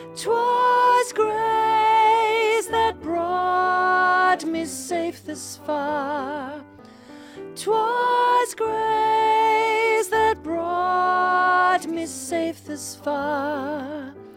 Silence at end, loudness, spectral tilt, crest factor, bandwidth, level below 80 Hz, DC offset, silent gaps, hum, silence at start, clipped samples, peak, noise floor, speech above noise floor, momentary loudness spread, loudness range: 0.05 s; -21 LUFS; -3 dB/octave; 14 dB; 16.5 kHz; -58 dBFS; under 0.1%; none; none; 0 s; under 0.1%; -8 dBFS; -44 dBFS; 19 dB; 13 LU; 6 LU